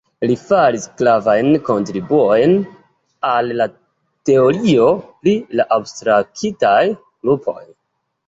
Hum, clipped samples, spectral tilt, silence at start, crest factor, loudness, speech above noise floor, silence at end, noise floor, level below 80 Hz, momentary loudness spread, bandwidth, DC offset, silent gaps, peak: none; under 0.1%; -6 dB/octave; 0.2 s; 14 dB; -16 LUFS; 57 dB; 0.65 s; -72 dBFS; -56 dBFS; 9 LU; 8 kHz; under 0.1%; none; -2 dBFS